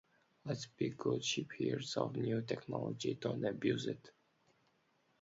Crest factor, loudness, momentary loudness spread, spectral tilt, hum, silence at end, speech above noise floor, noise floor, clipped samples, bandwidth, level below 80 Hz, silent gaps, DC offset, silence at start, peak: 20 dB; -39 LUFS; 7 LU; -5 dB/octave; none; 1.1 s; 38 dB; -76 dBFS; under 0.1%; 7.6 kHz; -74 dBFS; none; under 0.1%; 0.45 s; -20 dBFS